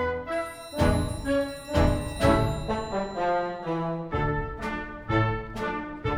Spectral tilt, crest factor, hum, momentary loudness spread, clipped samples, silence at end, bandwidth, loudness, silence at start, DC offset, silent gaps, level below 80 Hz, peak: -6.5 dB/octave; 20 dB; none; 7 LU; under 0.1%; 0 s; 17.5 kHz; -28 LUFS; 0 s; under 0.1%; none; -36 dBFS; -8 dBFS